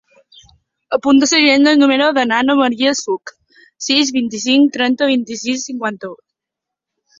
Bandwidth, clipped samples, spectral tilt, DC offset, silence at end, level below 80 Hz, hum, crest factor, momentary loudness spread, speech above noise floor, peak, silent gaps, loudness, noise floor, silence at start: 7.6 kHz; under 0.1%; -2 dB/octave; under 0.1%; 1.05 s; -60 dBFS; none; 14 dB; 13 LU; 69 dB; 0 dBFS; none; -14 LUFS; -83 dBFS; 0.9 s